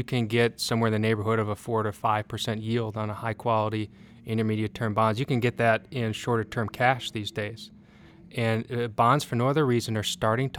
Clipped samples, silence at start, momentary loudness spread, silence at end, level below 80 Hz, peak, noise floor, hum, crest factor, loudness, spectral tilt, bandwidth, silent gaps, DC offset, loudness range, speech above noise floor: under 0.1%; 0 s; 8 LU; 0 s; -60 dBFS; -6 dBFS; -51 dBFS; none; 20 dB; -27 LUFS; -5.5 dB/octave; 16.5 kHz; none; under 0.1%; 2 LU; 25 dB